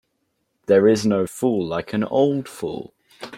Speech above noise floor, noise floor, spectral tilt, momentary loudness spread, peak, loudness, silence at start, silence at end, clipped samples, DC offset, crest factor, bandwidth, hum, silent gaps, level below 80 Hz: 52 dB; -72 dBFS; -6 dB/octave; 16 LU; -4 dBFS; -20 LUFS; 0.7 s; 0 s; under 0.1%; under 0.1%; 18 dB; 15.5 kHz; none; none; -60 dBFS